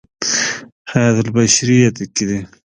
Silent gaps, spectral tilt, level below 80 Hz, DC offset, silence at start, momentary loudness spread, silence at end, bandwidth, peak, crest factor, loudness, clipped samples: 0.72-0.85 s; -4 dB/octave; -48 dBFS; under 0.1%; 0.2 s; 10 LU; 0.35 s; 10.5 kHz; 0 dBFS; 16 dB; -15 LUFS; under 0.1%